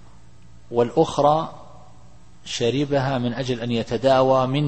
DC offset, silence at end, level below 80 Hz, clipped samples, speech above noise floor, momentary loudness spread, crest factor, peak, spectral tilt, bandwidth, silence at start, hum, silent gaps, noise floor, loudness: 0.7%; 0 s; -52 dBFS; under 0.1%; 29 dB; 9 LU; 18 dB; -4 dBFS; -6 dB/octave; 8.8 kHz; 0.7 s; none; none; -50 dBFS; -21 LUFS